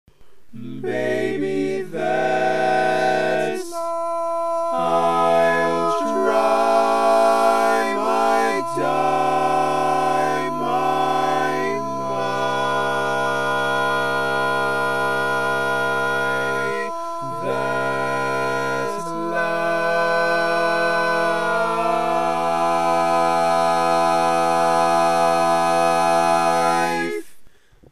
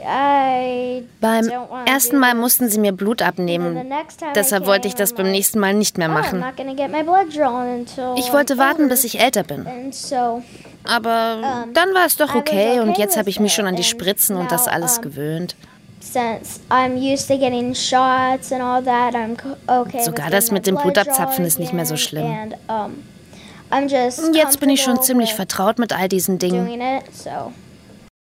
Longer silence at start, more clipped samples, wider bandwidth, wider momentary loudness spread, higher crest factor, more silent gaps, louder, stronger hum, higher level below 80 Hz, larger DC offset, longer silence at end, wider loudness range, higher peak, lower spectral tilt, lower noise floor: about the same, 0.05 s vs 0 s; neither; about the same, 15 kHz vs 16.5 kHz; second, 7 LU vs 11 LU; about the same, 16 dB vs 18 dB; neither; about the same, -20 LUFS vs -18 LUFS; neither; second, -62 dBFS vs -56 dBFS; first, 2% vs under 0.1%; second, 0 s vs 0.3 s; about the same, 4 LU vs 3 LU; second, -4 dBFS vs 0 dBFS; about the same, -4.5 dB/octave vs -3.5 dB/octave; first, -46 dBFS vs -41 dBFS